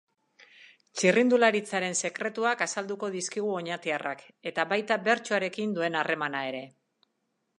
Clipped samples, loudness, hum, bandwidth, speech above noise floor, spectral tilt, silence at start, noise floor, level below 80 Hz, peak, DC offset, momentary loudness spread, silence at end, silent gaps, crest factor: under 0.1%; -28 LUFS; none; 11.5 kHz; 50 dB; -3.5 dB/octave; 0.6 s; -78 dBFS; -82 dBFS; -6 dBFS; under 0.1%; 11 LU; 0.9 s; none; 22 dB